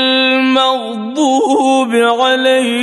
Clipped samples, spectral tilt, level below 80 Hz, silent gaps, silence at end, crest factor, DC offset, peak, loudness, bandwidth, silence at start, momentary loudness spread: under 0.1%; -2.5 dB/octave; -66 dBFS; none; 0 s; 12 dB; under 0.1%; 0 dBFS; -12 LUFS; 12 kHz; 0 s; 5 LU